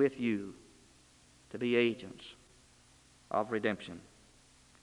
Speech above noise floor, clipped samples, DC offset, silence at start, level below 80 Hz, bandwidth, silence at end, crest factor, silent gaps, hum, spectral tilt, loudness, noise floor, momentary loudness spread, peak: 30 dB; under 0.1%; under 0.1%; 0 s; -70 dBFS; 11.5 kHz; 0.8 s; 22 dB; none; none; -6 dB/octave; -34 LUFS; -63 dBFS; 21 LU; -16 dBFS